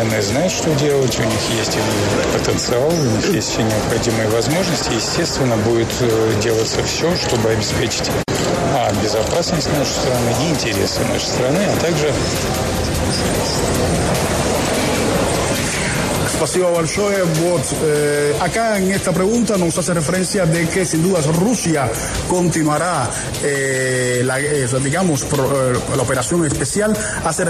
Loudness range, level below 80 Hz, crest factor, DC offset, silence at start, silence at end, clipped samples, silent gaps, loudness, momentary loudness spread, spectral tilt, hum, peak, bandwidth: 1 LU; -34 dBFS; 12 dB; under 0.1%; 0 s; 0 s; under 0.1%; none; -17 LUFS; 2 LU; -4.5 dB/octave; none; -4 dBFS; 13.5 kHz